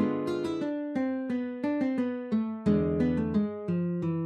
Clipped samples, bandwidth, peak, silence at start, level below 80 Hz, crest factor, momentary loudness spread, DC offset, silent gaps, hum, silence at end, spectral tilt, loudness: under 0.1%; 9.2 kHz; -14 dBFS; 0 s; -50 dBFS; 16 dB; 5 LU; under 0.1%; none; none; 0 s; -9 dB/octave; -30 LUFS